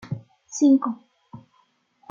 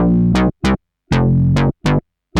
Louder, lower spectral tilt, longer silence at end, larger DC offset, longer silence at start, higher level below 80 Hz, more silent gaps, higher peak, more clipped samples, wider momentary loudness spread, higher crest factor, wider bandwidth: second, -20 LUFS vs -16 LUFS; second, -6 dB/octave vs -7.5 dB/octave; first, 0.75 s vs 0 s; neither; about the same, 0.1 s vs 0 s; second, -70 dBFS vs -28 dBFS; neither; second, -8 dBFS vs -2 dBFS; neither; first, 18 LU vs 6 LU; about the same, 16 dB vs 14 dB; second, 7.6 kHz vs 10.5 kHz